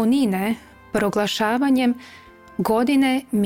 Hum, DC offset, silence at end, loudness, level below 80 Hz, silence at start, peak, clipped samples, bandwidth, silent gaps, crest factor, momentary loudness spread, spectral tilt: none; under 0.1%; 0 s; -21 LUFS; -56 dBFS; 0 s; -8 dBFS; under 0.1%; 17 kHz; none; 14 dB; 10 LU; -5.5 dB/octave